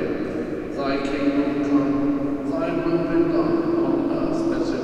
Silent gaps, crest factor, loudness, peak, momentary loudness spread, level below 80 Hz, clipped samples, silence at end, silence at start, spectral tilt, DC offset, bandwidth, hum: none; 14 dB; -22 LUFS; -8 dBFS; 6 LU; -44 dBFS; under 0.1%; 0 s; 0 s; -7.5 dB/octave; under 0.1%; 8.4 kHz; none